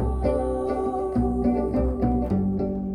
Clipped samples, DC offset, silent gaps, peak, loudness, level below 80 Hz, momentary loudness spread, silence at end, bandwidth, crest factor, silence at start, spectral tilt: under 0.1%; under 0.1%; none; -12 dBFS; -25 LUFS; -32 dBFS; 3 LU; 0 s; 10 kHz; 12 dB; 0 s; -10 dB/octave